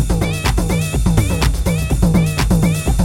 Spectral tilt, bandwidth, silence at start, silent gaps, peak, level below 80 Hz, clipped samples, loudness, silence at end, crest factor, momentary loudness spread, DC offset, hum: -5.5 dB/octave; 17 kHz; 0 s; none; 0 dBFS; -20 dBFS; under 0.1%; -16 LUFS; 0 s; 14 dB; 3 LU; under 0.1%; none